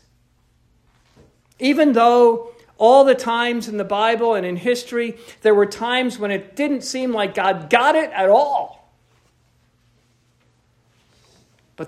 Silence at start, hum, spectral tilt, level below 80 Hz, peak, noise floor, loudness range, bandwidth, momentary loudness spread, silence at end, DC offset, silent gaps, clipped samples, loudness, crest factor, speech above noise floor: 1.6 s; none; -4.5 dB/octave; -64 dBFS; 0 dBFS; -60 dBFS; 4 LU; 14.5 kHz; 12 LU; 0 s; under 0.1%; none; under 0.1%; -17 LUFS; 18 dB; 43 dB